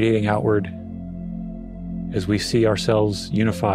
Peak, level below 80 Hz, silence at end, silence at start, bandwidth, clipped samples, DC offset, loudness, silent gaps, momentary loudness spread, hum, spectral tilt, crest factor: -4 dBFS; -42 dBFS; 0 s; 0 s; 15 kHz; under 0.1%; under 0.1%; -22 LUFS; none; 14 LU; none; -6.5 dB/octave; 16 dB